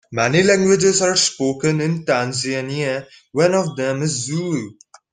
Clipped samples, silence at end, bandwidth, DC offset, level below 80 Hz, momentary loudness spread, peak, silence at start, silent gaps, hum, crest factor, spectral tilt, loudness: under 0.1%; 0.4 s; 10 kHz; under 0.1%; -56 dBFS; 10 LU; -2 dBFS; 0.1 s; none; none; 18 dB; -4 dB/octave; -18 LUFS